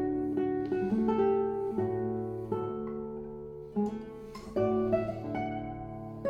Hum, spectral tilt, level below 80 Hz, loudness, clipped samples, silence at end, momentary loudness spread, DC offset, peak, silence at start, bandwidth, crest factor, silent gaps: none; -9 dB/octave; -56 dBFS; -33 LUFS; under 0.1%; 0 s; 13 LU; under 0.1%; -16 dBFS; 0 s; 7.4 kHz; 16 dB; none